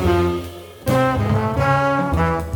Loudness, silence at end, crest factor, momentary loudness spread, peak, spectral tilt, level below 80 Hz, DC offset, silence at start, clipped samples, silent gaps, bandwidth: -19 LUFS; 0 s; 14 dB; 10 LU; -4 dBFS; -7 dB/octave; -32 dBFS; under 0.1%; 0 s; under 0.1%; none; over 20 kHz